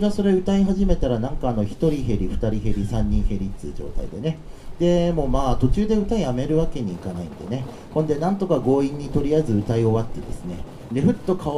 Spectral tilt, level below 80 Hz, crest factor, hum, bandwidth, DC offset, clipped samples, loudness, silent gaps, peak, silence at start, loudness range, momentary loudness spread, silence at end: -8 dB/octave; -30 dBFS; 16 dB; none; 11.5 kHz; under 0.1%; under 0.1%; -23 LUFS; none; -4 dBFS; 0 s; 3 LU; 13 LU; 0 s